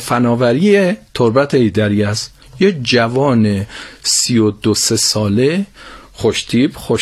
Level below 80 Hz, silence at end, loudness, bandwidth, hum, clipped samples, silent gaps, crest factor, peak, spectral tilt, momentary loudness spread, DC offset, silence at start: -46 dBFS; 0 s; -14 LUFS; 14 kHz; none; under 0.1%; none; 14 dB; 0 dBFS; -4.5 dB/octave; 8 LU; under 0.1%; 0 s